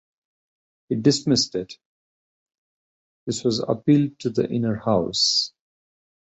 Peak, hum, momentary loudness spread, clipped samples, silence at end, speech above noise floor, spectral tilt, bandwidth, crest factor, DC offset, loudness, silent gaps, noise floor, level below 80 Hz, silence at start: -4 dBFS; none; 12 LU; under 0.1%; 0.85 s; over 68 dB; -5 dB/octave; 8.2 kHz; 20 dB; under 0.1%; -22 LUFS; 1.85-2.46 s, 2.58-3.27 s; under -90 dBFS; -58 dBFS; 0.9 s